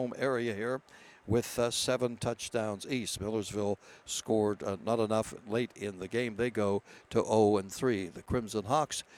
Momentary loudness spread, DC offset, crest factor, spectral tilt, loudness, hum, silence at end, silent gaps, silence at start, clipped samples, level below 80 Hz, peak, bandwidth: 7 LU; under 0.1%; 18 dB; -4.5 dB/octave; -33 LUFS; none; 0 s; none; 0 s; under 0.1%; -58 dBFS; -14 dBFS; 17.5 kHz